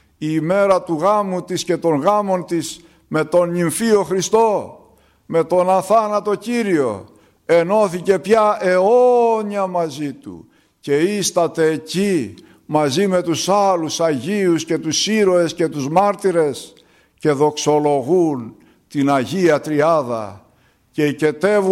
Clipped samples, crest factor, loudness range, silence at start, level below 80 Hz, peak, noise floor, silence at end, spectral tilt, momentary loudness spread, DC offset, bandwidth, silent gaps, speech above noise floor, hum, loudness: under 0.1%; 14 dB; 3 LU; 0.2 s; -60 dBFS; -2 dBFS; -56 dBFS; 0 s; -5 dB/octave; 9 LU; under 0.1%; 16 kHz; none; 39 dB; none; -17 LUFS